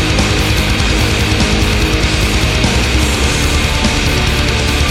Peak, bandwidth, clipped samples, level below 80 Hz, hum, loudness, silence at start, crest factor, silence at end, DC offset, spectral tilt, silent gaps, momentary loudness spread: 0 dBFS; 16.5 kHz; under 0.1%; -16 dBFS; none; -13 LUFS; 0 s; 12 dB; 0 s; under 0.1%; -4 dB/octave; none; 1 LU